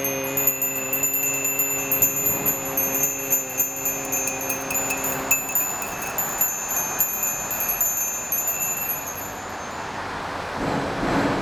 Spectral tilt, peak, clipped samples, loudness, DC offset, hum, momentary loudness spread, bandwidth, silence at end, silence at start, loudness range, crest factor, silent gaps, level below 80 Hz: -2 dB/octave; -4 dBFS; under 0.1%; -22 LUFS; under 0.1%; none; 10 LU; over 20 kHz; 0 s; 0 s; 4 LU; 22 dB; none; -50 dBFS